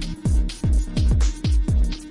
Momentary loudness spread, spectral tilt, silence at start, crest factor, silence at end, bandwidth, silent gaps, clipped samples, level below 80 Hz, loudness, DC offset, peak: 2 LU; -6 dB/octave; 0 s; 10 dB; 0 s; 11.5 kHz; none; under 0.1%; -20 dBFS; -23 LUFS; under 0.1%; -10 dBFS